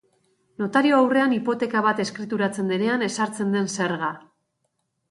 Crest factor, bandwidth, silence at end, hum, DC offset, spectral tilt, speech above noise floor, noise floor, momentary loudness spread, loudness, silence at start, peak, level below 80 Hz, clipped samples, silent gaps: 18 dB; 11.5 kHz; 0.9 s; none; under 0.1%; -5 dB/octave; 52 dB; -75 dBFS; 9 LU; -23 LUFS; 0.6 s; -6 dBFS; -70 dBFS; under 0.1%; none